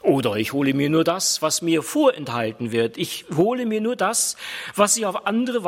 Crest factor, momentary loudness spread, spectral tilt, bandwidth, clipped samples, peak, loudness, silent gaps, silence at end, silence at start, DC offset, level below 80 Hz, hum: 18 dB; 7 LU; -3.5 dB/octave; 16.5 kHz; under 0.1%; -2 dBFS; -21 LUFS; none; 0 s; 0.05 s; under 0.1%; -66 dBFS; none